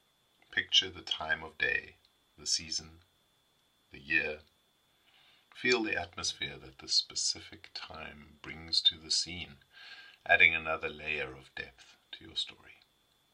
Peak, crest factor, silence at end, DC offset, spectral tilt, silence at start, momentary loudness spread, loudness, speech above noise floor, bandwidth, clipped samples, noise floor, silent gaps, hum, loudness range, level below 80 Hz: -8 dBFS; 28 dB; 0.6 s; under 0.1%; -1 dB/octave; 0.5 s; 20 LU; -31 LUFS; 38 dB; 15.5 kHz; under 0.1%; -72 dBFS; none; none; 6 LU; -66 dBFS